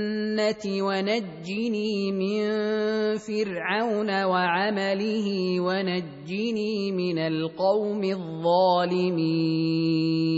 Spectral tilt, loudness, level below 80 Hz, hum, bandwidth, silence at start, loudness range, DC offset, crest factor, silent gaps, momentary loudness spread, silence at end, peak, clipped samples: -6.5 dB/octave; -25 LUFS; -68 dBFS; none; 8 kHz; 0 s; 2 LU; under 0.1%; 14 dB; none; 5 LU; 0 s; -10 dBFS; under 0.1%